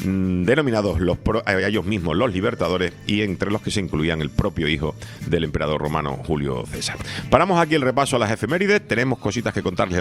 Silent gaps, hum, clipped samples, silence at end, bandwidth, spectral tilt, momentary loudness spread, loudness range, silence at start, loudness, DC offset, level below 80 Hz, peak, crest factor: none; none; under 0.1%; 0 s; 15 kHz; -5.5 dB/octave; 6 LU; 3 LU; 0 s; -21 LUFS; under 0.1%; -40 dBFS; 0 dBFS; 22 dB